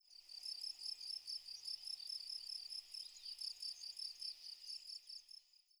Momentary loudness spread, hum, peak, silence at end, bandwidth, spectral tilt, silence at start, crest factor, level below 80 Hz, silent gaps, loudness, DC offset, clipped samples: 6 LU; none; -32 dBFS; 0.2 s; over 20 kHz; 4 dB/octave; 0.05 s; 18 dB; -88 dBFS; none; -47 LUFS; under 0.1%; under 0.1%